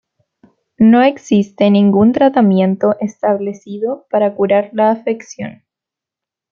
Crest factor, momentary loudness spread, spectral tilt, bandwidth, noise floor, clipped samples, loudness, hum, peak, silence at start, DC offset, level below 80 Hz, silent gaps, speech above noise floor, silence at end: 12 dB; 12 LU; -7.5 dB/octave; 7.2 kHz; -85 dBFS; under 0.1%; -14 LUFS; none; -2 dBFS; 0.8 s; under 0.1%; -58 dBFS; none; 72 dB; 1 s